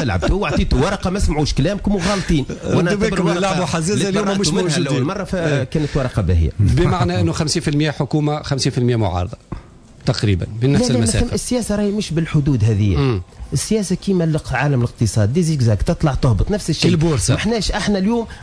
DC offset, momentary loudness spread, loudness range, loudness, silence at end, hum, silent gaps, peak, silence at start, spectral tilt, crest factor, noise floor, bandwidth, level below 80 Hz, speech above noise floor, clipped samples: under 0.1%; 4 LU; 2 LU; -18 LUFS; 0 s; none; none; -6 dBFS; 0 s; -5.5 dB/octave; 12 dB; -37 dBFS; 11 kHz; -28 dBFS; 20 dB; under 0.1%